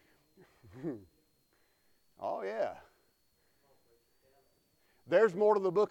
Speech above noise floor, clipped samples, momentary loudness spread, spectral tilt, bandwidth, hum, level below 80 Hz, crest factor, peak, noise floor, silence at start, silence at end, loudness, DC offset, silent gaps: 43 dB; under 0.1%; 17 LU; -6.5 dB/octave; 8.4 kHz; none; -78 dBFS; 20 dB; -16 dBFS; -73 dBFS; 0.75 s; 0 s; -32 LUFS; under 0.1%; none